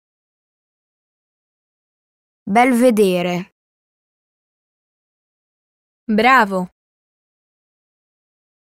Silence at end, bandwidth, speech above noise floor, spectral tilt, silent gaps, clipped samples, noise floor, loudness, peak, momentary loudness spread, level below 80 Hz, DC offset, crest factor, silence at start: 2.1 s; 16 kHz; over 76 dB; -5.5 dB/octave; 3.52-6.07 s; under 0.1%; under -90 dBFS; -15 LUFS; -2 dBFS; 14 LU; -62 dBFS; under 0.1%; 20 dB; 2.45 s